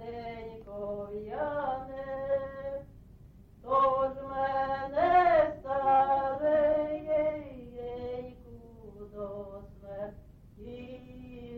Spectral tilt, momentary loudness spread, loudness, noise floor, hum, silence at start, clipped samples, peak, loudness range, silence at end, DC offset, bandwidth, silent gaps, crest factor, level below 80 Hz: -8 dB/octave; 22 LU; -30 LUFS; -54 dBFS; none; 0 s; under 0.1%; -14 dBFS; 16 LU; 0 s; under 0.1%; 5.8 kHz; none; 18 dB; -54 dBFS